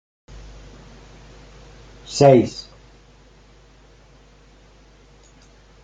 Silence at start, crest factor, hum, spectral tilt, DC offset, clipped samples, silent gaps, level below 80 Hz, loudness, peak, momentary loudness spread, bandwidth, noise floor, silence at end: 2.1 s; 22 dB; 50 Hz at -50 dBFS; -6.5 dB/octave; under 0.1%; under 0.1%; none; -48 dBFS; -16 LUFS; -2 dBFS; 31 LU; 9.2 kHz; -50 dBFS; 3.25 s